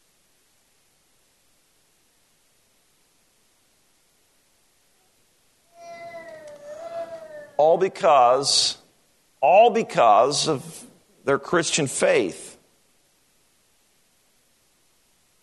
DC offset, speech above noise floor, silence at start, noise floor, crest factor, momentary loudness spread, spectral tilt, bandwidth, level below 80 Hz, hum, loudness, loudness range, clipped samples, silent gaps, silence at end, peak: under 0.1%; 45 dB; 5.8 s; -64 dBFS; 20 dB; 24 LU; -3 dB/octave; 12.5 kHz; -70 dBFS; none; -20 LUFS; 17 LU; under 0.1%; none; 2.9 s; -4 dBFS